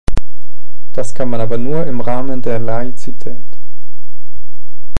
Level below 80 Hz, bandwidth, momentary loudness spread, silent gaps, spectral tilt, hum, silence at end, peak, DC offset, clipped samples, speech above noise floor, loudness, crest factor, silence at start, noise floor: -30 dBFS; 11.5 kHz; 12 LU; none; -7.5 dB/octave; none; 0 s; 0 dBFS; 70%; 0.7%; 27 dB; -22 LUFS; 18 dB; 0.05 s; -48 dBFS